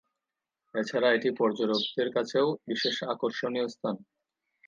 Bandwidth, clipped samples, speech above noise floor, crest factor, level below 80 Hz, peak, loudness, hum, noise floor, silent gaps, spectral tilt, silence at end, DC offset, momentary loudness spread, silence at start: 7.6 kHz; under 0.1%; 59 dB; 18 dB; -82 dBFS; -12 dBFS; -29 LUFS; none; -88 dBFS; none; -4.5 dB/octave; 0.7 s; under 0.1%; 9 LU; 0.75 s